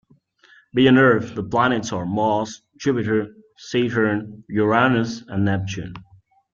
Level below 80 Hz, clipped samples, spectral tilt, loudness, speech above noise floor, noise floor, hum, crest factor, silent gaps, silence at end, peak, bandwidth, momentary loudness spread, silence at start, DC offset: -54 dBFS; under 0.1%; -6 dB/octave; -20 LUFS; 35 dB; -55 dBFS; none; 18 dB; none; 0.5 s; -2 dBFS; 7.4 kHz; 12 LU; 0.75 s; under 0.1%